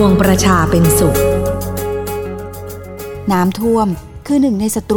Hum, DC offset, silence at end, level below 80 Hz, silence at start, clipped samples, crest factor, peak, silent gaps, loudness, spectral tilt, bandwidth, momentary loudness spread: none; under 0.1%; 0 s; -30 dBFS; 0 s; under 0.1%; 14 dB; 0 dBFS; none; -14 LUFS; -5.5 dB/octave; 18 kHz; 16 LU